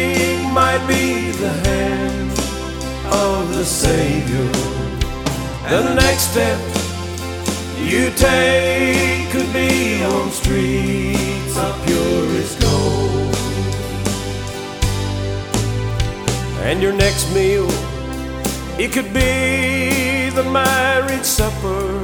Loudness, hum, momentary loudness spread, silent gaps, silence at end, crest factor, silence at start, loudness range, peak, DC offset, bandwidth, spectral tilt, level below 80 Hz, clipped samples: -18 LUFS; none; 8 LU; none; 0 s; 18 dB; 0 s; 4 LU; 0 dBFS; under 0.1%; over 20 kHz; -4.5 dB/octave; -28 dBFS; under 0.1%